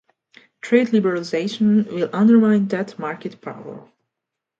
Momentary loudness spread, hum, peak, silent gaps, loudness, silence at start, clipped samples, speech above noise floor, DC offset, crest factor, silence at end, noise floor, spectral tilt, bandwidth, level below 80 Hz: 19 LU; none; -2 dBFS; none; -18 LUFS; 0.65 s; under 0.1%; 65 dB; under 0.1%; 18 dB; 0.8 s; -83 dBFS; -7 dB/octave; 7.6 kHz; -68 dBFS